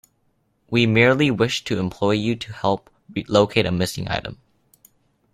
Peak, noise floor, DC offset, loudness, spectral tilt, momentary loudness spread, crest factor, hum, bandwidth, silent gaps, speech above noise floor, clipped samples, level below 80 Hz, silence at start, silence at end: -2 dBFS; -66 dBFS; under 0.1%; -20 LUFS; -5.5 dB/octave; 12 LU; 20 dB; none; 15.5 kHz; none; 46 dB; under 0.1%; -52 dBFS; 0.7 s; 1 s